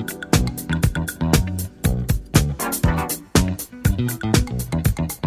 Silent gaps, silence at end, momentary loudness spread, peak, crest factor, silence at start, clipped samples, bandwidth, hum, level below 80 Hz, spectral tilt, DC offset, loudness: none; 0 s; 4 LU; 0 dBFS; 20 dB; 0 s; under 0.1%; 16 kHz; none; -28 dBFS; -5 dB/octave; under 0.1%; -21 LUFS